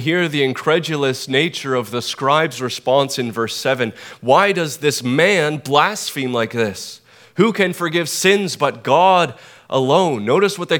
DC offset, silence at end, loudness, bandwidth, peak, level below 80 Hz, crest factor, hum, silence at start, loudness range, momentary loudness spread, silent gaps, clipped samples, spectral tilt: under 0.1%; 0 s; -17 LUFS; 19.5 kHz; 0 dBFS; -68 dBFS; 18 dB; none; 0 s; 2 LU; 8 LU; none; under 0.1%; -4 dB/octave